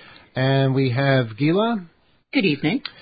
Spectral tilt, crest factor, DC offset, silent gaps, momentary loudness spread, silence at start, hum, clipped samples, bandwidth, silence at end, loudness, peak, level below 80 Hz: -12 dB/octave; 16 dB; under 0.1%; none; 6 LU; 0.35 s; none; under 0.1%; 5 kHz; 0.1 s; -21 LUFS; -4 dBFS; -60 dBFS